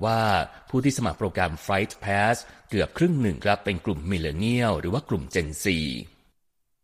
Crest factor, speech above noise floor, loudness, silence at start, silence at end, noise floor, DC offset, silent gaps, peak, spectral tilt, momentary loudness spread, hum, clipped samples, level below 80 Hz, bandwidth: 18 dB; 45 dB; -26 LUFS; 0 s; 0.75 s; -70 dBFS; under 0.1%; none; -8 dBFS; -5.5 dB/octave; 5 LU; none; under 0.1%; -44 dBFS; 15 kHz